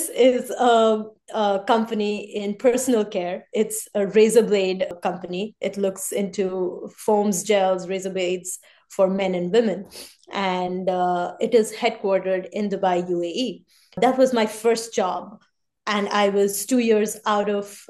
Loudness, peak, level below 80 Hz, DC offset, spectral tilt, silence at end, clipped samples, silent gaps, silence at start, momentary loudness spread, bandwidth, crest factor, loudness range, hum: -22 LUFS; -4 dBFS; -68 dBFS; under 0.1%; -4.5 dB/octave; 0.1 s; under 0.1%; none; 0 s; 10 LU; 12.5 kHz; 18 dB; 3 LU; none